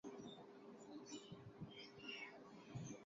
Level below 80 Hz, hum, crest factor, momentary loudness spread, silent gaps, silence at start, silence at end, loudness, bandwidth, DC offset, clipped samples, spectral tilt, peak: -80 dBFS; none; 16 dB; 8 LU; none; 0.05 s; 0 s; -56 LUFS; 7.4 kHz; under 0.1%; under 0.1%; -4 dB/octave; -40 dBFS